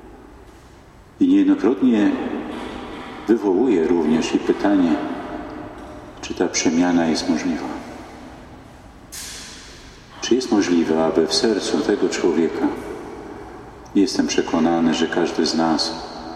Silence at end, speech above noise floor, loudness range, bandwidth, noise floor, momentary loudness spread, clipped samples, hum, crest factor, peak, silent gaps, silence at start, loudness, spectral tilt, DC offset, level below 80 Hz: 0 s; 27 dB; 4 LU; 13.5 kHz; -45 dBFS; 19 LU; under 0.1%; none; 16 dB; -4 dBFS; none; 0 s; -19 LUFS; -4 dB/octave; under 0.1%; -48 dBFS